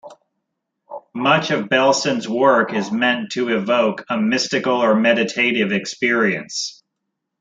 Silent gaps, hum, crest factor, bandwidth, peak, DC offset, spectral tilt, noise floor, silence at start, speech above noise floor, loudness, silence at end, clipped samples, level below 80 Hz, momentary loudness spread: none; none; 20 dB; 9.2 kHz; 0 dBFS; under 0.1%; -4 dB/octave; -78 dBFS; 0.05 s; 60 dB; -18 LUFS; 0.7 s; under 0.1%; -68 dBFS; 8 LU